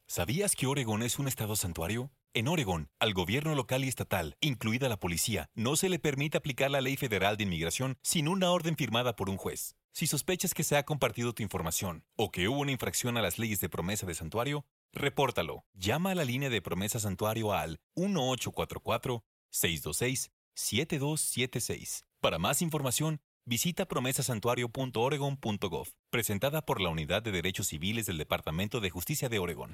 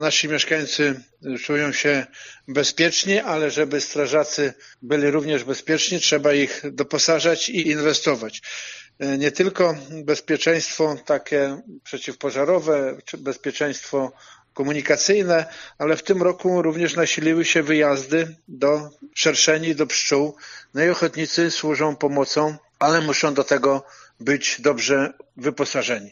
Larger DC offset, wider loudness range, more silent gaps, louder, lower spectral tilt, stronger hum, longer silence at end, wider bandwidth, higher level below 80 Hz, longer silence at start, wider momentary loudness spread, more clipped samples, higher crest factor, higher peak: neither; about the same, 2 LU vs 3 LU; first, 9.84-9.89 s, 14.71-14.89 s, 15.66-15.73 s, 17.83-17.90 s, 19.26-19.49 s, 20.33-20.52 s, 23.24-23.41 s, 25.99-26.04 s vs none; second, -32 LUFS vs -21 LUFS; first, -4 dB/octave vs -2.5 dB/octave; neither; about the same, 0 s vs 0 s; first, 16.5 kHz vs 7.4 kHz; first, -56 dBFS vs -68 dBFS; about the same, 0.1 s vs 0 s; second, 6 LU vs 11 LU; neither; about the same, 22 dB vs 18 dB; second, -12 dBFS vs -4 dBFS